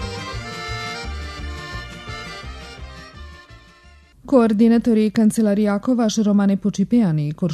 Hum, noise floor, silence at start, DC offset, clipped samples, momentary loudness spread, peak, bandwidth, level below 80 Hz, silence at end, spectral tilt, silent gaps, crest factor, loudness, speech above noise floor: none; -48 dBFS; 0 s; under 0.1%; under 0.1%; 20 LU; -2 dBFS; 13 kHz; -40 dBFS; 0 s; -6.5 dB/octave; none; 18 dB; -19 LUFS; 32 dB